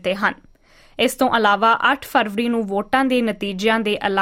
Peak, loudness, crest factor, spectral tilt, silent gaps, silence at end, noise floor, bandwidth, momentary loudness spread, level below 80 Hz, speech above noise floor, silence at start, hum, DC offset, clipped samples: -2 dBFS; -19 LUFS; 16 dB; -4 dB/octave; none; 0 s; -50 dBFS; 16.5 kHz; 7 LU; -52 dBFS; 32 dB; 0.05 s; none; under 0.1%; under 0.1%